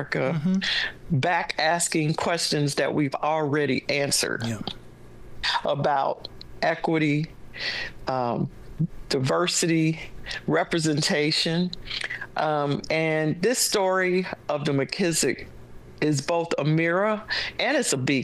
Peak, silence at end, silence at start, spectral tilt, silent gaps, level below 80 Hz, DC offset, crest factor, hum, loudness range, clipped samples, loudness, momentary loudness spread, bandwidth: -8 dBFS; 0 s; 0 s; -4 dB/octave; none; -50 dBFS; under 0.1%; 16 dB; none; 3 LU; under 0.1%; -25 LUFS; 9 LU; 12.5 kHz